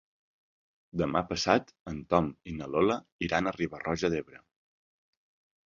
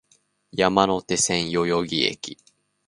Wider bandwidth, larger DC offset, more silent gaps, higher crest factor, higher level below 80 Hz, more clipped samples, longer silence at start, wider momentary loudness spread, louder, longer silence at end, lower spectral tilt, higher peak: second, 7.6 kHz vs 11.5 kHz; neither; first, 1.80-1.85 s, 3.12-3.19 s vs none; about the same, 26 dB vs 24 dB; about the same, -54 dBFS vs -54 dBFS; neither; first, 0.95 s vs 0.55 s; second, 10 LU vs 14 LU; second, -30 LUFS vs -22 LUFS; first, 1.3 s vs 0.55 s; first, -5.5 dB/octave vs -3 dB/octave; second, -6 dBFS vs 0 dBFS